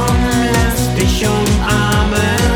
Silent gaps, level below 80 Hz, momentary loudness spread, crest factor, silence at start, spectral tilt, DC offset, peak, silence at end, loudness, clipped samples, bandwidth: none; -20 dBFS; 1 LU; 12 dB; 0 s; -5 dB/octave; under 0.1%; 0 dBFS; 0 s; -14 LUFS; under 0.1%; over 20 kHz